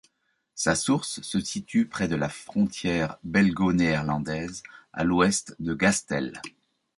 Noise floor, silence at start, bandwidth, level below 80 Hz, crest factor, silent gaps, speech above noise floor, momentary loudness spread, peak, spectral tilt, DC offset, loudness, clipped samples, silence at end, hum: -73 dBFS; 0.55 s; 11.5 kHz; -52 dBFS; 18 dB; none; 47 dB; 12 LU; -8 dBFS; -4.5 dB/octave; under 0.1%; -26 LUFS; under 0.1%; 0.5 s; none